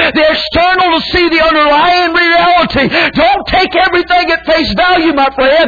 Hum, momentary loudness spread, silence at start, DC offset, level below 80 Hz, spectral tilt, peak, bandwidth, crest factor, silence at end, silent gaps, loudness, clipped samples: none; 3 LU; 0 s; under 0.1%; -32 dBFS; -5.5 dB/octave; 0 dBFS; 5 kHz; 8 dB; 0 s; none; -9 LUFS; under 0.1%